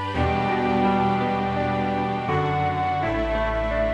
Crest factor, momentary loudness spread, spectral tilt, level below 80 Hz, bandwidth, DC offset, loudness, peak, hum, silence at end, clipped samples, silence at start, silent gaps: 14 dB; 3 LU; -7.5 dB/octave; -36 dBFS; 9.4 kHz; under 0.1%; -23 LUFS; -10 dBFS; none; 0 s; under 0.1%; 0 s; none